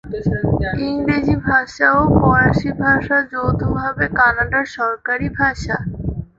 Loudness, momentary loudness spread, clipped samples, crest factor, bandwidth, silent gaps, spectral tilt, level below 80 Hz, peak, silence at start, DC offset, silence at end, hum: -17 LUFS; 8 LU; under 0.1%; 16 dB; 7.8 kHz; none; -7.5 dB/octave; -32 dBFS; -2 dBFS; 0.05 s; under 0.1%; 0.15 s; none